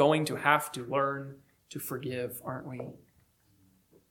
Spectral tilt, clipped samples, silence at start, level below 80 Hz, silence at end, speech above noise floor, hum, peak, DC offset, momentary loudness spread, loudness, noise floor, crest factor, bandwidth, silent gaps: -5 dB/octave; under 0.1%; 0 s; -72 dBFS; 1.15 s; 36 dB; none; -8 dBFS; under 0.1%; 17 LU; -31 LUFS; -67 dBFS; 24 dB; 19 kHz; none